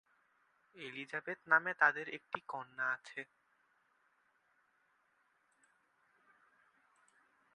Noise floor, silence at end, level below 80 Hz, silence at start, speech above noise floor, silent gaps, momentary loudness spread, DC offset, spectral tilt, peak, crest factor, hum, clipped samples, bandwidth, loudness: -77 dBFS; 4.3 s; under -90 dBFS; 0.75 s; 39 dB; none; 17 LU; under 0.1%; -4 dB/octave; -14 dBFS; 28 dB; none; under 0.1%; 10.5 kHz; -36 LUFS